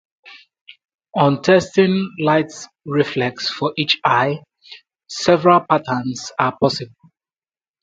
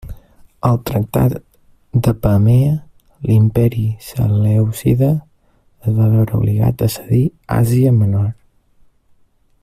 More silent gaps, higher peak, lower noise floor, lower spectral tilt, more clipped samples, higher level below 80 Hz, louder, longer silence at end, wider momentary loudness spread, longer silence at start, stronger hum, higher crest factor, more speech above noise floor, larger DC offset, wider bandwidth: first, 0.61-0.65 s vs none; about the same, 0 dBFS vs -2 dBFS; first, under -90 dBFS vs -55 dBFS; second, -5.5 dB/octave vs -8.5 dB/octave; neither; second, -58 dBFS vs -38 dBFS; about the same, -18 LUFS vs -16 LUFS; second, 0.95 s vs 1.3 s; first, 13 LU vs 8 LU; first, 0.25 s vs 0.05 s; neither; about the same, 18 dB vs 14 dB; first, over 73 dB vs 41 dB; neither; second, 9.2 kHz vs 15 kHz